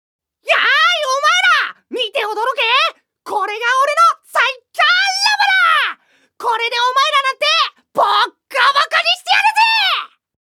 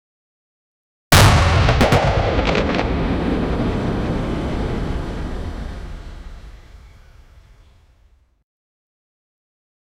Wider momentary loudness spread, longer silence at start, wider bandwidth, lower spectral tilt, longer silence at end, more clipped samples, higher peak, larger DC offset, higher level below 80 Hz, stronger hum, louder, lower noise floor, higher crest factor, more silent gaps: second, 9 LU vs 20 LU; second, 0.45 s vs 1.1 s; second, 17 kHz vs over 20 kHz; second, 1.5 dB/octave vs -5 dB/octave; second, 0.35 s vs 3.1 s; neither; about the same, 0 dBFS vs 0 dBFS; neither; second, -82 dBFS vs -26 dBFS; neither; first, -14 LUFS vs -18 LUFS; second, -41 dBFS vs -55 dBFS; about the same, 16 dB vs 20 dB; neither